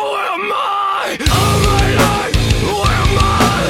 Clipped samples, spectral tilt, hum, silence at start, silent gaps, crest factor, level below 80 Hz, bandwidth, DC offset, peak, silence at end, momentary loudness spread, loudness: under 0.1%; -4.5 dB/octave; none; 0 s; none; 14 dB; -22 dBFS; 17 kHz; under 0.1%; 0 dBFS; 0 s; 5 LU; -14 LUFS